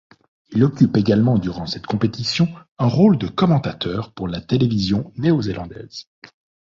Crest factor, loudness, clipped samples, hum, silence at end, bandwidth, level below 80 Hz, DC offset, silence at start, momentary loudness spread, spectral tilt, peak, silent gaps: 16 dB; -19 LUFS; under 0.1%; none; 0.65 s; 7.6 kHz; -46 dBFS; under 0.1%; 0.5 s; 12 LU; -7.5 dB/octave; -2 dBFS; 2.68-2.76 s